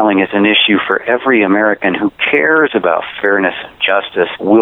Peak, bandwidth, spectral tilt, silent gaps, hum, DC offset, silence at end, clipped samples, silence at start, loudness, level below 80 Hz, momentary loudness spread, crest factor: 0 dBFS; 4.1 kHz; -7.5 dB/octave; none; none; under 0.1%; 0 s; under 0.1%; 0 s; -12 LUFS; -56 dBFS; 6 LU; 12 dB